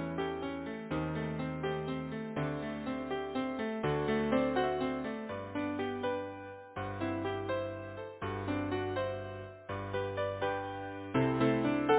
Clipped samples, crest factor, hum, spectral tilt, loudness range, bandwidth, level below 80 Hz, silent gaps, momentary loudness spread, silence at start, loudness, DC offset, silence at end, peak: under 0.1%; 20 dB; none; -5.5 dB/octave; 3 LU; 4 kHz; -56 dBFS; none; 11 LU; 0 s; -36 LUFS; under 0.1%; 0 s; -16 dBFS